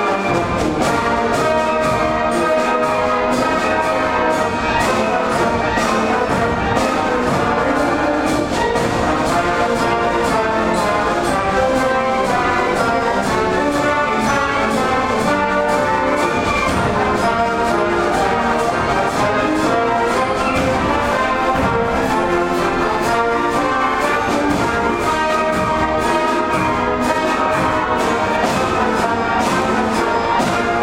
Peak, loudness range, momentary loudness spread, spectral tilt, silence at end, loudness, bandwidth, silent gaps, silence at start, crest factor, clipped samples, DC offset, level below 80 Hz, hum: -2 dBFS; 0 LU; 1 LU; -5 dB/octave; 0 s; -16 LUFS; 16.5 kHz; none; 0 s; 14 dB; under 0.1%; under 0.1%; -36 dBFS; none